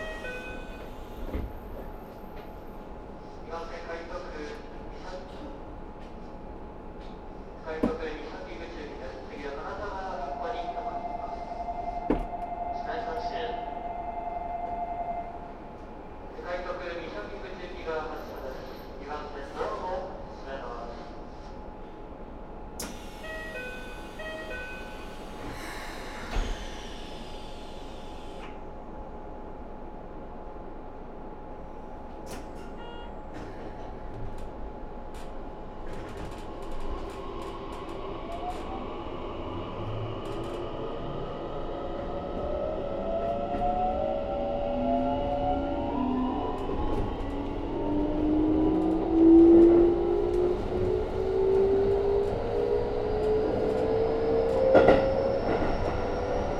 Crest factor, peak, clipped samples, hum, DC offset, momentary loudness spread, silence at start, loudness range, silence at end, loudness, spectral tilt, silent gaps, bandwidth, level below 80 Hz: 24 dB; -6 dBFS; under 0.1%; none; under 0.1%; 18 LU; 0 s; 19 LU; 0 s; -30 LUFS; -7 dB/octave; none; 13 kHz; -40 dBFS